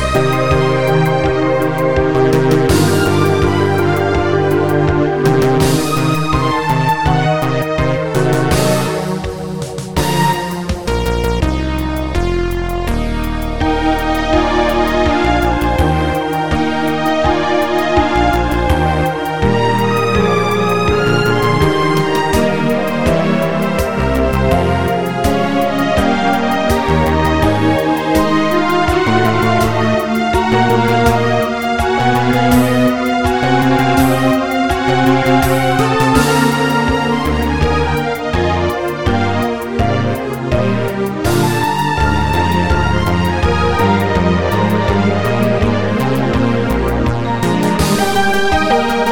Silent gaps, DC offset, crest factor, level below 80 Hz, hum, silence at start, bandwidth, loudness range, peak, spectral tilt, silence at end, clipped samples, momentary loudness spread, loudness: none; under 0.1%; 14 dB; -26 dBFS; none; 0 s; over 20 kHz; 3 LU; 0 dBFS; -6 dB/octave; 0 s; under 0.1%; 5 LU; -14 LUFS